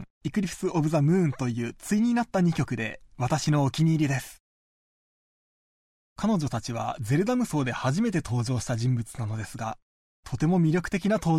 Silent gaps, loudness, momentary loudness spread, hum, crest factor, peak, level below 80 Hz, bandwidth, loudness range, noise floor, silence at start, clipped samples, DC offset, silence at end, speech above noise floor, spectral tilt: 0.10-0.21 s, 4.40-6.16 s, 9.82-10.23 s; -27 LUFS; 9 LU; none; 14 dB; -12 dBFS; -52 dBFS; 15 kHz; 4 LU; under -90 dBFS; 0 s; under 0.1%; under 0.1%; 0 s; over 64 dB; -6.5 dB/octave